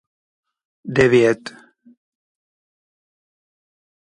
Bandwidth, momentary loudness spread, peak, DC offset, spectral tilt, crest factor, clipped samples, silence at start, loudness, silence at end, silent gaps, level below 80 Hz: 10.5 kHz; 23 LU; -2 dBFS; under 0.1%; -6 dB/octave; 22 dB; under 0.1%; 0.85 s; -17 LUFS; 2.65 s; none; -56 dBFS